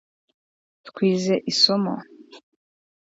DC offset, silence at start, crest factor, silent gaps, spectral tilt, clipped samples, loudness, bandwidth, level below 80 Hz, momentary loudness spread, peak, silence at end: under 0.1%; 0.85 s; 22 dB; none; -4.5 dB/octave; under 0.1%; -20 LUFS; 8 kHz; -72 dBFS; 10 LU; -2 dBFS; 0.75 s